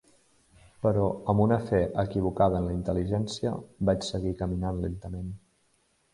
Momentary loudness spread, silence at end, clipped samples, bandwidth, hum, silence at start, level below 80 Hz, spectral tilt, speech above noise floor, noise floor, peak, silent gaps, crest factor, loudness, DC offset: 10 LU; 0.75 s; under 0.1%; 11.5 kHz; none; 0.8 s; -44 dBFS; -7.5 dB/octave; 42 dB; -69 dBFS; -10 dBFS; none; 18 dB; -28 LUFS; under 0.1%